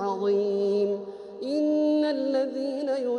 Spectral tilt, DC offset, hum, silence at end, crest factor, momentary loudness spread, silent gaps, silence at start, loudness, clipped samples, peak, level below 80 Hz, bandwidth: -6.5 dB/octave; under 0.1%; none; 0 s; 10 dB; 8 LU; none; 0 s; -26 LUFS; under 0.1%; -14 dBFS; -74 dBFS; 9.6 kHz